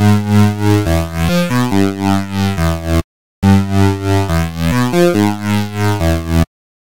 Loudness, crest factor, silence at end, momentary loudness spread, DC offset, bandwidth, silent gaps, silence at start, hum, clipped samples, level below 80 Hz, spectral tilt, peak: -14 LUFS; 14 dB; 0.4 s; 6 LU; 4%; 17 kHz; 3.04-3.42 s; 0 s; none; under 0.1%; -28 dBFS; -6.5 dB/octave; 0 dBFS